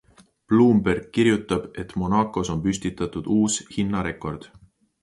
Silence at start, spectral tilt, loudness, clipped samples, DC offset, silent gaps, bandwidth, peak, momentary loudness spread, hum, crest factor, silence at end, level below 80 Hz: 0.5 s; -5.5 dB/octave; -23 LUFS; under 0.1%; under 0.1%; none; 11.5 kHz; -6 dBFS; 11 LU; none; 18 dB; 0.55 s; -46 dBFS